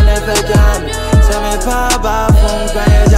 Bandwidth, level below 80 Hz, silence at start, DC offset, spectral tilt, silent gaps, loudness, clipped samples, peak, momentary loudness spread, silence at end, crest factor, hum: 16 kHz; -12 dBFS; 0 s; under 0.1%; -5 dB/octave; none; -12 LUFS; under 0.1%; 0 dBFS; 4 LU; 0 s; 10 dB; none